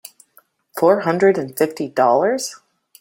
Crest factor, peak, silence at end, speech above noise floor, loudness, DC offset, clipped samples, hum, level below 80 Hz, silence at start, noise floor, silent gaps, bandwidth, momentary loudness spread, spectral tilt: 18 dB; -2 dBFS; 0.45 s; 39 dB; -18 LUFS; under 0.1%; under 0.1%; none; -66 dBFS; 0.75 s; -56 dBFS; none; 17 kHz; 9 LU; -5 dB/octave